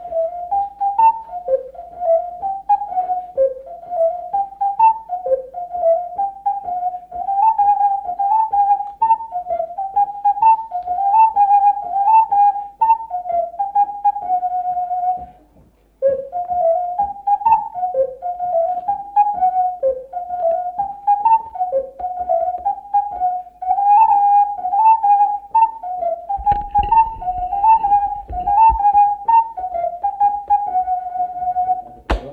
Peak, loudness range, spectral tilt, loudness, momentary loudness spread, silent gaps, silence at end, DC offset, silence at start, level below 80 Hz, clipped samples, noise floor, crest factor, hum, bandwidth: -4 dBFS; 5 LU; -7 dB/octave; -17 LUFS; 11 LU; none; 0 s; under 0.1%; 0 s; -40 dBFS; under 0.1%; -52 dBFS; 12 dB; none; 4.4 kHz